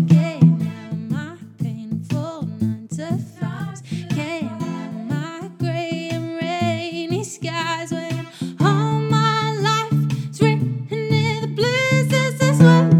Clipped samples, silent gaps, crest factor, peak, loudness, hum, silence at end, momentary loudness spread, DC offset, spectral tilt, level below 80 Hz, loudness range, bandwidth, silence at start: under 0.1%; none; 18 dB; 0 dBFS; -21 LUFS; none; 0 s; 12 LU; under 0.1%; -6.5 dB/octave; -62 dBFS; 7 LU; 12.5 kHz; 0 s